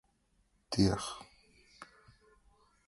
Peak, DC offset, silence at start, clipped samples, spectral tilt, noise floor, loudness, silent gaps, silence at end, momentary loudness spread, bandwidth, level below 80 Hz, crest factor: -16 dBFS; under 0.1%; 0.7 s; under 0.1%; -5.5 dB/octave; -74 dBFS; -33 LUFS; none; 1.05 s; 25 LU; 11.5 kHz; -56 dBFS; 24 dB